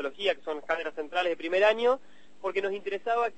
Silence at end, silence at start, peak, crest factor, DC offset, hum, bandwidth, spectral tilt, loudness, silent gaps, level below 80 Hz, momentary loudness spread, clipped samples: 0.05 s; 0 s; -10 dBFS; 18 dB; 0.5%; none; 8.6 kHz; -3.5 dB/octave; -29 LUFS; none; -70 dBFS; 9 LU; under 0.1%